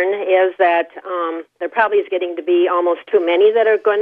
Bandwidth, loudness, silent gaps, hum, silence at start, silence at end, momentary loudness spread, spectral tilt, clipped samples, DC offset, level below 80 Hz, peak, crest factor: 4.1 kHz; -16 LUFS; none; none; 0 s; 0 s; 10 LU; -6 dB/octave; under 0.1%; under 0.1%; -74 dBFS; -2 dBFS; 14 dB